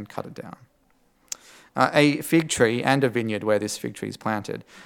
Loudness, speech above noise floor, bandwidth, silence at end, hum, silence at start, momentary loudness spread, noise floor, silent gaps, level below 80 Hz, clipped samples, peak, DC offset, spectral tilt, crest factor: -23 LUFS; 40 dB; 18 kHz; 0.05 s; none; 0 s; 17 LU; -63 dBFS; none; -62 dBFS; under 0.1%; -2 dBFS; under 0.1%; -4.5 dB/octave; 22 dB